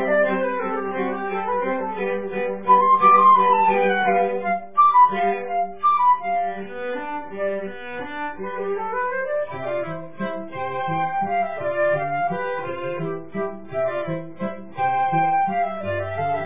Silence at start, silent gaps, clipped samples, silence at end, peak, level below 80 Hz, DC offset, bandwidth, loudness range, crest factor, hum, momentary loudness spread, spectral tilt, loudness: 0 s; none; under 0.1%; 0 s; -4 dBFS; -60 dBFS; 1%; 3.8 kHz; 10 LU; 16 dB; none; 14 LU; -9.5 dB/octave; -22 LUFS